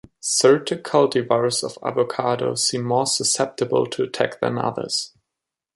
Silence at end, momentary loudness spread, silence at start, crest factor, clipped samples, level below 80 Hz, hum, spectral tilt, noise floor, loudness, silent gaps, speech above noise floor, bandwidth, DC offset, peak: 0.7 s; 8 LU; 0.25 s; 18 dB; under 0.1%; -64 dBFS; none; -3.5 dB/octave; -84 dBFS; -21 LUFS; none; 64 dB; 11.5 kHz; under 0.1%; -2 dBFS